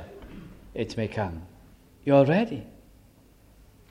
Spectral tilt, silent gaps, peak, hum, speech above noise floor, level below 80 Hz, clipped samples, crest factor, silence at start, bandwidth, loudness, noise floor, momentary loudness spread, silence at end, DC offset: -8 dB/octave; none; -6 dBFS; none; 32 dB; -52 dBFS; under 0.1%; 22 dB; 0 s; 12 kHz; -25 LUFS; -56 dBFS; 25 LU; 1.2 s; under 0.1%